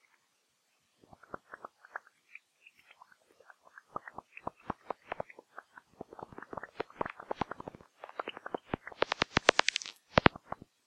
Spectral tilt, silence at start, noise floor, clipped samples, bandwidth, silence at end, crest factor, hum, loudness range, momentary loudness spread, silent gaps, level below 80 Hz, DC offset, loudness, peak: -3.5 dB/octave; 1.5 s; -76 dBFS; under 0.1%; 14.5 kHz; 0.55 s; 32 dB; none; 21 LU; 25 LU; none; -58 dBFS; under 0.1%; -34 LUFS; -6 dBFS